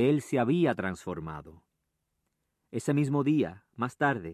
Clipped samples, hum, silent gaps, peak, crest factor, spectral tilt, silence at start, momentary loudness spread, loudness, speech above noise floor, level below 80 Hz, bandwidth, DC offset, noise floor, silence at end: under 0.1%; none; none; -12 dBFS; 18 dB; -7 dB/octave; 0 s; 13 LU; -29 LUFS; 52 dB; -60 dBFS; 13.5 kHz; under 0.1%; -81 dBFS; 0 s